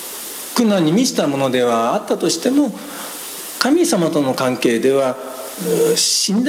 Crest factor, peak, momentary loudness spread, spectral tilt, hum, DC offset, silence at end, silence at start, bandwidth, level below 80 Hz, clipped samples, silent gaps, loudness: 18 dB; 0 dBFS; 13 LU; -4 dB/octave; none; under 0.1%; 0 s; 0 s; 17.5 kHz; -64 dBFS; under 0.1%; none; -17 LUFS